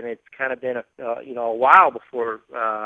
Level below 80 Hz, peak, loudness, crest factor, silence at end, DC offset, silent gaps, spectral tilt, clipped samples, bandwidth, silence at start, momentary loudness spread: -72 dBFS; 0 dBFS; -20 LUFS; 20 dB; 0 s; under 0.1%; none; -5.5 dB/octave; under 0.1%; 8 kHz; 0 s; 17 LU